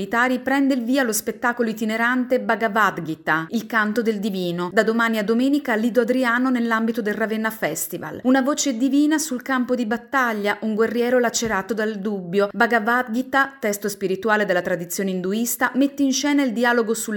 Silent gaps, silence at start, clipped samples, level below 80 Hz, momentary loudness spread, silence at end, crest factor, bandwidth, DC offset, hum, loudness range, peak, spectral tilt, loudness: none; 0 s; under 0.1%; -62 dBFS; 5 LU; 0 s; 18 dB; 17.5 kHz; under 0.1%; none; 1 LU; -4 dBFS; -4 dB/octave; -21 LUFS